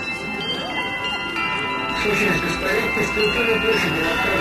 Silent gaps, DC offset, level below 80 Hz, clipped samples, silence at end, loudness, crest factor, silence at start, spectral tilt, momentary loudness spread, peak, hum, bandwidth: none; under 0.1%; -42 dBFS; under 0.1%; 0 s; -20 LUFS; 14 dB; 0 s; -4 dB/octave; 6 LU; -8 dBFS; none; 13.5 kHz